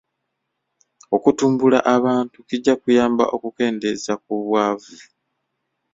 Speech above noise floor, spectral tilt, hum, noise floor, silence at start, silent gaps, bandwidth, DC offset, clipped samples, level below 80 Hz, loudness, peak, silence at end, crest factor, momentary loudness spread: 58 dB; -5.5 dB/octave; none; -76 dBFS; 1.1 s; none; 7.8 kHz; under 0.1%; under 0.1%; -62 dBFS; -19 LUFS; -2 dBFS; 0.9 s; 18 dB; 8 LU